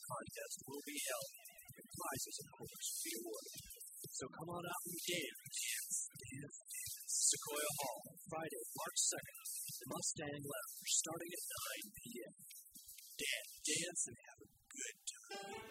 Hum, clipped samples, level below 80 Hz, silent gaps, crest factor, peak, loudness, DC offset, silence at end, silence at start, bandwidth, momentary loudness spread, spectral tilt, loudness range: none; under 0.1%; -80 dBFS; none; 22 dB; -24 dBFS; -43 LUFS; under 0.1%; 0 s; 0 s; 16 kHz; 15 LU; -1 dB/octave; 6 LU